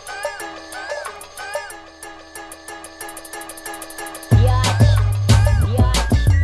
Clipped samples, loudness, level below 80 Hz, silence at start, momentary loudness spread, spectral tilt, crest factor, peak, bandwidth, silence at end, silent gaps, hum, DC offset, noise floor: under 0.1%; -18 LUFS; -24 dBFS; 0 s; 20 LU; -5.5 dB/octave; 16 dB; -2 dBFS; 12.5 kHz; 0 s; none; none; under 0.1%; -38 dBFS